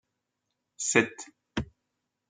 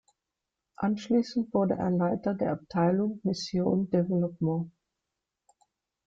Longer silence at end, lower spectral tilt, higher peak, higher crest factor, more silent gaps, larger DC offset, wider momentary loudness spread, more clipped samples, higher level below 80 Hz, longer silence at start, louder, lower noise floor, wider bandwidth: second, 0.65 s vs 1.4 s; second, -3 dB/octave vs -7.5 dB/octave; first, -8 dBFS vs -14 dBFS; first, 26 dB vs 16 dB; neither; neither; first, 20 LU vs 5 LU; neither; first, -56 dBFS vs -64 dBFS; about the same, 0.8 s vs 0.8 s; about the same, -29 LUFS vs -29 LUFS; second, -83 dBFS vs -87 dBFS; first, 9.6 kHz vs 7.8 kHz